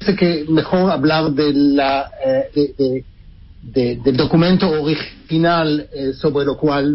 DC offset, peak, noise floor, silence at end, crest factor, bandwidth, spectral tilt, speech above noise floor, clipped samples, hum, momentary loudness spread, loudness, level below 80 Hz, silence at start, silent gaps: under 0.1%; -2 dBFS; -41 dBFS; 0 s; 14 dB; 5.8 kHz; -11 dB/octave; 25 dB; under 0.1%; none; 7 LU; -17 LUFS; -42 dBFS; 0 s; none